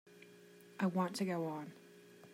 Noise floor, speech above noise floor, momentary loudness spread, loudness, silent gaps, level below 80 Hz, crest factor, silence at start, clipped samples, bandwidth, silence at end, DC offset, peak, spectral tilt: -60 dBFS; 22 dB; 23 LU; -39 LUFS; none; -88 dBFS; 16 dB; 0.05 s; under 0.1%; 16 kHz; 0 s; under 0.1%; -24 dBFS; -6 dB/octave